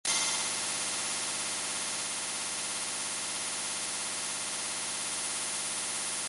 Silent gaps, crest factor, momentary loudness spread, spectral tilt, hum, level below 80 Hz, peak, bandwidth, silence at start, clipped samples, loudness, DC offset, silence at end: none; 18 dB; 3 LU; 1 dB/octave; none; -72 dBFS; -16 dBFS; 12 kHz; 0.05 s; under 0.1%; -31 LUFS; under 0.1%; 0 s